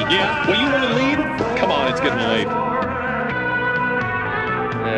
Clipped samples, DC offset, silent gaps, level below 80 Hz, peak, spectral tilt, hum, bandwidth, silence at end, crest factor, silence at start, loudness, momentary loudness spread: under 0.1%; under 0.1%; none; -44 dBFS; -6 dBFS; -5.5 dB/octave; none; 11 kHz; 0 s; 14 dB; 0 s; -19 LUFS; 5 LU